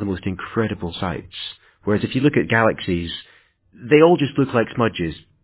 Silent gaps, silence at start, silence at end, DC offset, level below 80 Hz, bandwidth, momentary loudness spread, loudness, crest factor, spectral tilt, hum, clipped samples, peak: none; 0 s; 0.25 s; under 0.1%; -44 dBFS; 4 kHz; 16 LU; -20 LUFS; 20 dB; -10.5 dB/octave; none; under 0.1%; 0 dBFS